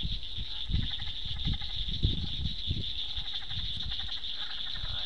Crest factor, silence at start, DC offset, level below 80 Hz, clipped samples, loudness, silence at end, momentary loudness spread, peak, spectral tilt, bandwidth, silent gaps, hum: 22 dB; 0 s; 2%; -38 dBFS; under 0.1%; -34 LUFS; 0 s; 4 LU; -12 dBFS; -5 dB/octave; 9.6 kHz; none; none